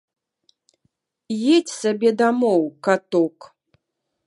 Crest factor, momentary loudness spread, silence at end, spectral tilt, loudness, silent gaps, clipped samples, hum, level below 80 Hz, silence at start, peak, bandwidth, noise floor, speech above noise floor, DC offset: 20 dB; 6 LU; 0.8 s; -5 dB/octave; -20 LUFS; none; under 0.1%; none; -78 dBFS; 1.3 s; -2 dBFS; 11.5 kHz; -78 dBFS; 59 dB; under 0.1%